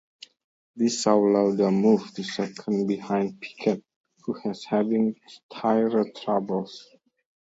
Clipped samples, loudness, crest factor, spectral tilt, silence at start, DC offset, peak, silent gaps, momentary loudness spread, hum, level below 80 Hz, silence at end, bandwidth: under 0.1%; -25 LUFS; 20 dB; -6 dB/octave; 0.75 s; under 0.1%; -6 dBFS; 3.96-4.04 s, 5.43-5.49 s; 12 LU; none; -72 dBFS; 0.75 s; 8 kHz